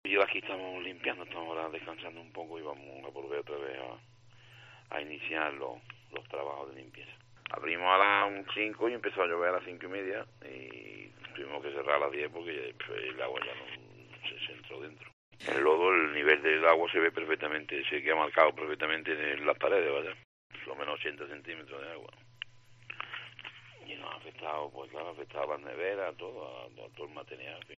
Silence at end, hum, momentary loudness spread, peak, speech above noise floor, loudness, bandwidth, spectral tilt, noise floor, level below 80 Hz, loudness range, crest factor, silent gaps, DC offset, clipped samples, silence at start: 0.05 s; none; 21 LU; -10 dBFS; 23 dB; -32 LUFS; 9 kHz; -5 dB/octave; -57 dBFS; -78 dBFS; 14 LU; 26 dB; 15.13-15.31 s, 20.25-20.50 s; under 0.1%; under 0.1%; 0.05 s